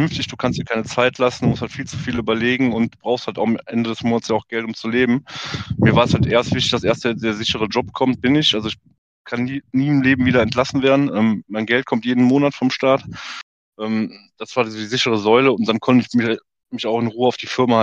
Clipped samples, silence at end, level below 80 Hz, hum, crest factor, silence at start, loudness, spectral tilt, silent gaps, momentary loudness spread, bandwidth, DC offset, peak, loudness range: under 0.1%; 0 s; -48 dBFS; none; 16 dB; 0 s; -19 LUFS; -5.5 dB/octave; 8.98-9.25 s, 13.43-13.73 s; 11 LU; 8.4 kHz; under 0.1%; -2 dBFS; 3 LU